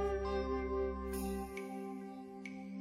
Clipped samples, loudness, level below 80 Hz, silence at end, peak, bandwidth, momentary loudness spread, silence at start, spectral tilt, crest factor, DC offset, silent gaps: under 0.1%; -41 LUFS; -48 dBFS; 0 s; -26 dBFS; 16 kHz; 10 LU; 0 s; -6.5 dB/octave; 14 dB; under 0.1%; none